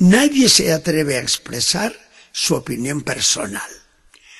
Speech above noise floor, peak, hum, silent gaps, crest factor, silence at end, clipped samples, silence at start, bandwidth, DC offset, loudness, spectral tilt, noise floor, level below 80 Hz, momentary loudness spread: 33 dB; 0 dBFS; none; none; 18 dB; 0.65 s; under 0.1%; 0 s; 12.5 kHz; under 0.1%; -16 LUFS; -3.5 dB/octave; -50 dBFS; -50 dBFS; 14 LU